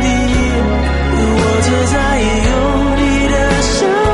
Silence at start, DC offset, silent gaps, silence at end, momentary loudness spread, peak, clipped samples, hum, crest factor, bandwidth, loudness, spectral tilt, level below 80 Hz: 0 s; under 0.1%; none; 0 s; 2 LU; -2 dBFS; under 0.1%; none; 10 dB; 11.5 kHz; -13 LUFS; -5 dB/octave; -18 dBFS